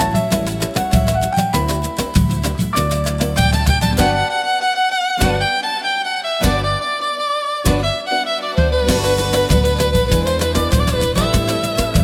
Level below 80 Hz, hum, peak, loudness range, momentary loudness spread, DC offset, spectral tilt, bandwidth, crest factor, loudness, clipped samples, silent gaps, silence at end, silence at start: -24 dBFS; none; -2 dBFS; 2 LU; 4 LU; under 0.1%; -5 dB/octave; 18 kHz; 14 dB; -17 LUFS; under 0.1%; none; 0 s; 0 s